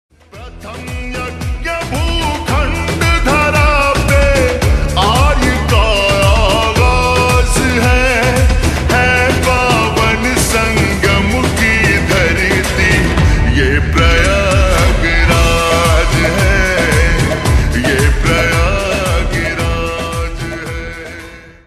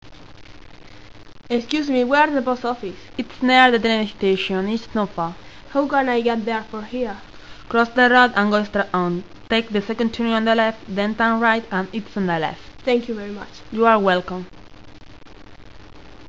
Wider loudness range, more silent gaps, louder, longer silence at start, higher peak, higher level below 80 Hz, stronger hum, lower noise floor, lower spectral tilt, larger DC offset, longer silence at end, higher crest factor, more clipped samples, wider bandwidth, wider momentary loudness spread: about the same, 3 LU vs 4 LU; neither; first, -12 LUFS vs -20 LUFS; first, 0.35 s vs 0 s; about the same, 0 dBFS vs 0 dBFS; first, -16 dBFS vs -48 dBFS; neither; second, -33 dBFS vs -43 dBFS; about the same, -4.5 dB/octave vs -5.5 dB/octave; second, under 0.1% vs 0.7%; first, 0.15 s vs 0 s; second, 12 dB vs 20 dB; neither; first, 14 kHz vs 7.8 kHz; second, 10 LU vs 15 LU